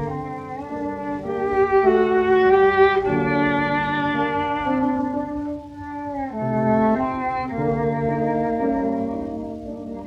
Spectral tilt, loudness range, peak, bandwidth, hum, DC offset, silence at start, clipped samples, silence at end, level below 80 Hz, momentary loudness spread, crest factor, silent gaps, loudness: -8 dB/octave; 5 LU; -6 dBFS; 6.2 kHz; none; under 0.1%; 0 s; under 0.1%; 0 s; -46 dBFS; 14 LU; 16 dB; none; -21 LUFS